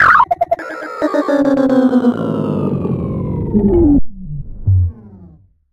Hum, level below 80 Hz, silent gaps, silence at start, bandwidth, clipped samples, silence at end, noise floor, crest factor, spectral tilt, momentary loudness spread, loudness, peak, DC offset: none; -28 dBFS; none; 0 s; 8.6 kHz; under 0.1%; 0.45 s; -43 dBFS; 14 dB; -8.5 dB/octave; 10 LU; -15 LUFS; 0 dBFS; under 0.1%